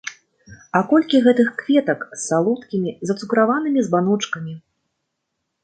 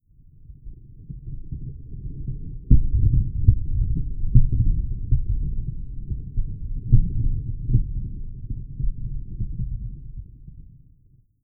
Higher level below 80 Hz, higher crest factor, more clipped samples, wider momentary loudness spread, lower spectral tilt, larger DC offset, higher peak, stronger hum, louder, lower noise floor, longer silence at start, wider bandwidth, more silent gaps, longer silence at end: second, -66 dBFS vs -24 dBFS; about the same, 18 dB vs 22 dB; neither; second, 11 LU vs 20 LU; second, -5.5 dB/octave vs -16.5 dB/octave; neither; about the same, -2 dBFS vs 0 dBFS; neither; first, -19 LUFS vs -26 LUFS; first, -76 dBFS vs -56 dBFS; second, 0.05 s vs 0.5 s; first, 9.4 kHz vs 0.5 kHz; neither; first, 1.05 s vs 0.8 s